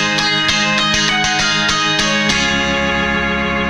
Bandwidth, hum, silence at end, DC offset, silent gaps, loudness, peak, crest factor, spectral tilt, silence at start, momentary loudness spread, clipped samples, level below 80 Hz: 13.5 kHz; none; 0 s; under 0.1%; none; -13 LUFS; 0 dBFS; 16 dB; -2.5 dB/octave; 0 s; 3 LU; under 0.1%; -34 dBFS